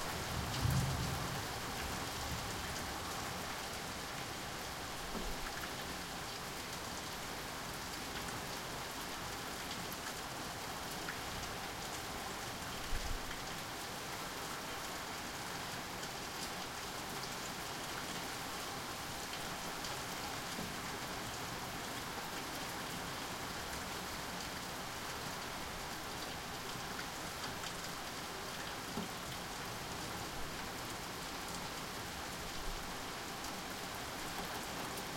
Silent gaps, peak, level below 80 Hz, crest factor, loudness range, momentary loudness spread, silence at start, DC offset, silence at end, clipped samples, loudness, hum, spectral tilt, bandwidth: none; -24 dBFS; -54 dBFS; 20 dB; 1 LU; 2 LU; 0 s; under 0.1%; 0 s; under 0.1%; -42 LUFS; none; -3 dB/octave; 16.5 kHz